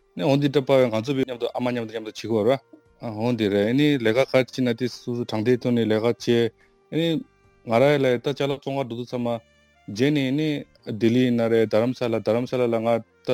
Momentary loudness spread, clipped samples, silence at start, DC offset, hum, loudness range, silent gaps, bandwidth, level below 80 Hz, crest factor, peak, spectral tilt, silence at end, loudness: 10 LU; under 0.1%; 0.15 s; under 0.1%; none; 2 LU; none; 16.5 kHz; -64 dBFS; 18 dB; -4 dBFS; -6.5 dB/octave; 0 s; -23 LUFS